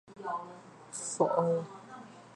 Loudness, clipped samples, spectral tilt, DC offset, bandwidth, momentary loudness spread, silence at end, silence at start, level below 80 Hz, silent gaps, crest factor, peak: -33 LUFS; under 0.1%; -5.5 dB/octave; under 0.1%; 11.5 kHz; 21 LU; 0 s; 0.05 s; -80 dBFS; none; 22 dB; -12 dBFS